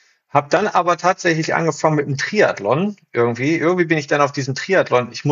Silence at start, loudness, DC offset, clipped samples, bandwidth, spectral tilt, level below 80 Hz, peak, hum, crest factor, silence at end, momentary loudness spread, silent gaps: 0.35 s; -18 LUFS; under 0.1%; under 0.1%; 7.6 kHz; -5.5 dB/octave; -68 dBFS; -2 dBFS; none; 16 dB; 0 s; 4 LU; none